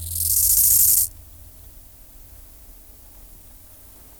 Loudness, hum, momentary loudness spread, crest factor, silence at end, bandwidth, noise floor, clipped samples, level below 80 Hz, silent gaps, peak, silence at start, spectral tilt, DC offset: -15 LUFS; none; 7 LU; 16 dB; 3.05 s; over 20 kHz; -45 dBFS; under 0.1%; -44 dBFS; none; -6 dBFS; 0 s; 0 dB/octave; under 0.1%